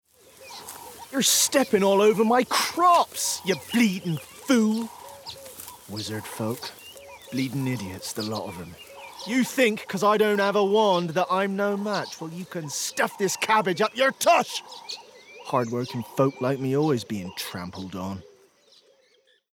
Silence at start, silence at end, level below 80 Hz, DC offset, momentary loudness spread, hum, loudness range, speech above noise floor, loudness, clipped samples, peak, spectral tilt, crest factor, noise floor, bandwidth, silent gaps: 0.4 s; 1.3 s; -70 dBFS; under 0.1%; 20 LU; none; 10 LU; 39 dB; -24 LUFS; under 0.1%; -8 dBFS; -3.5 dB/octave; 16 dB; -63 dBFS; 20 kHz; none